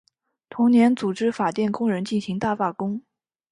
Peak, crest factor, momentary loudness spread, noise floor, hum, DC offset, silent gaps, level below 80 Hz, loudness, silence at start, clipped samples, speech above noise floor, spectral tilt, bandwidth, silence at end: -8 dBFS; 16 dB; 12 LU; -48 dBFS; none; under 0.1%; none; -64 dBFS; -22 LUFS; 0.5 s; under 0.1%; 27 dB; -6.5 dB/octave; 10.5 kHz; 0.5 s